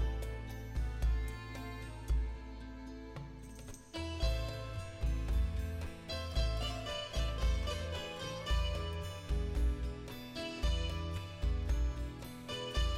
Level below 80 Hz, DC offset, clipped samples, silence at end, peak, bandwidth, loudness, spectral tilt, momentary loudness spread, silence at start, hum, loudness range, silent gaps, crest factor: -38 dBFS; under 0.1%; under 0.1%; 0 s; -24 dBFS; 14.5 kHz; -39 LUFS; -5 dB/octave; 11 LU; 0 s; none; 4 LU; none; 14 dB